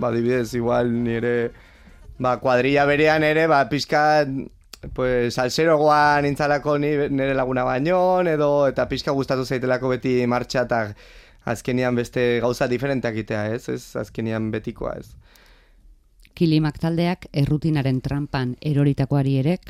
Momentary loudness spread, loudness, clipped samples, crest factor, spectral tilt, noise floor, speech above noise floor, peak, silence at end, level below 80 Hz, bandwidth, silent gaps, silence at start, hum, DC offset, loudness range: 10 LU; -21 LUFS; under 0.1%; 16 dB; -6.5 dB/octave; -52 dBFS; 31 dB; -4 dBFS; 0 s; -46 dBFS; 14.5 kHz; none; 0 s; none; under 0.1%; 6 LU